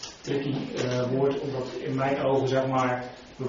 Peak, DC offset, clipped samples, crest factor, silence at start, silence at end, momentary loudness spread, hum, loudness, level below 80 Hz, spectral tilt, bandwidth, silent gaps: -12 dBFS; under 0.1%; under 0.1%; 16 dB; 0 s; 0 s; 8 LU; none; -27 LUFS; -58 dBFS; -5.5 dB/octave; 7.4 kHz; none